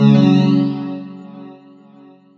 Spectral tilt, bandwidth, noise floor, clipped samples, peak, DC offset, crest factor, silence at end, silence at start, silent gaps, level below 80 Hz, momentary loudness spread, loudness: -9 dB/octave; 6.8 kHz; -45 dBFS; under 0.1%; 0 dBFS; under 0.1%; 16 dB; 0.85 s; 0 s; none; -56 dBFS; 24 LU; -15 LUFS